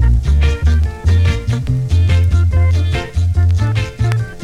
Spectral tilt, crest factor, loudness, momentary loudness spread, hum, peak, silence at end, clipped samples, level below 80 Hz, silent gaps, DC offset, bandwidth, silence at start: -7 dB/octave; 12 dB; -15 LUFS; 5 LU; none; 0 dBFS; 0 s; under 0.1%; -18 dBFS; none; under 0.1%; 9.2 kHz; 0 s